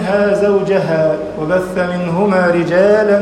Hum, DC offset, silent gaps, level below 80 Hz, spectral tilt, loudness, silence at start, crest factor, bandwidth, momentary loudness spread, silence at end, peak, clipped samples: none; under 0.1%; none; -46 dBFS; -7 dB/octave; -14 LUFS; 0 s; 12 dB; 11 kHz; 6 LU; 0 s; 0 dBFS; under 0.1%